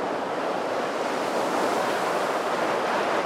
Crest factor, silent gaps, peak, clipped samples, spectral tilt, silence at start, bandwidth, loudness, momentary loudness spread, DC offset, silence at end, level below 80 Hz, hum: 12 dB; none; -12 dBFS; under 0.1%; -3.5 dB/octave; 0 s; 16 kHz; -26 LUFS; 3 LU; under 0.1%; 0 s; -70 dBFS; none